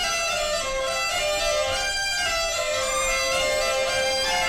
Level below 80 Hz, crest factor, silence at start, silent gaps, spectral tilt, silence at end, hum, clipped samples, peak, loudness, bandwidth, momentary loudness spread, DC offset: -42 dBFS; 10 dB; 0 s; none; 0 dB/octave; 0 s; none; under 0.1%; -14 dBFS; -23 LUFS; 18.5 kHz; 2 LU; under 0.1%